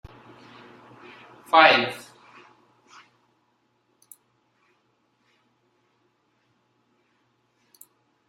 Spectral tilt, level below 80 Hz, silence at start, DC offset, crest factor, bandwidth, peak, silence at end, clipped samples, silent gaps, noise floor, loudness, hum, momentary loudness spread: -3.5 dB/octave; -66 dBFS; 1.55 s; under 0.1%; 28 dB; 15.5 kHz; -2 dBFS; 6.3 s; under 0.1%; none; -70 dBFS; -18 LUFS; none; 33 LU